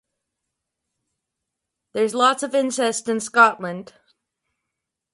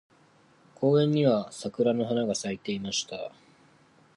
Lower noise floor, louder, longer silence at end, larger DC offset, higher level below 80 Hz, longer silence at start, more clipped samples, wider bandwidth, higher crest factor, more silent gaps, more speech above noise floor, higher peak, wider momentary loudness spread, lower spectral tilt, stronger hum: first, -82 dBFS vs -60 dBFS; first, -19 LUFS vs -27 LUFS; first, 1.3 s vs 0.9 s; neither; second, -74 dBFS vs -68 dBFS; first, 1.95 s vs 0.8 s; neither; about the same, 11.5 kHz vs 11.5 kHz; first, 24 dB vs 18 dB; neither; first, 62 dB vs 34 dB; first, 0 dBFS vs -12 dBFS; about the same, 15 LU vs 14 LU; second, -3 dB/octave vs -5.5 dB/octave; neither